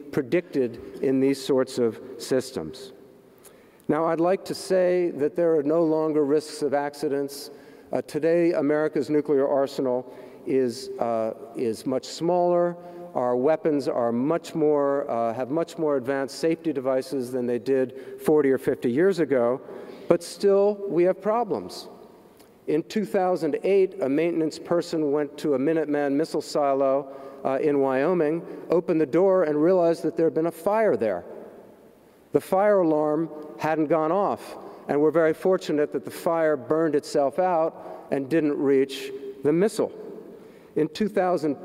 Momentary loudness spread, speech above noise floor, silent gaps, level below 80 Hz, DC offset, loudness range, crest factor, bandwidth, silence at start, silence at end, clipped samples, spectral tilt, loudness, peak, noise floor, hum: 10 LU; 30 dB; none; -68 dBFS; under 0.1%; 3 LU; 22 dB; 16 kHz; 0 s; 0 s; under 0.1%; -6.5 dB/octave; -24 LUFS; -2 dBFS; -53 dBFS; none